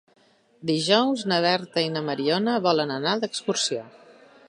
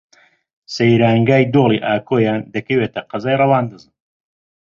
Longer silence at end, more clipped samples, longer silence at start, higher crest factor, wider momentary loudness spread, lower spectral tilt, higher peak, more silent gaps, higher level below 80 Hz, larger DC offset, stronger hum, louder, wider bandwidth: second, 0.6 s vs 0.95 s; neither; about the same, 0.6 s vs 0.7 s; about the same, 20 dB vs 16 dB; second, 6 LU vs 10 LU; second, -4 dB/octave vs -7.5 dB/octave; about the same, -4 dBFS vs -2 dBFS; neither; second, -74 dBFS vs -54 dBFS; neither; neither; second, -24 LUFS vs -16 LUFS; first, 11.5 kHz vs 7.4 kHz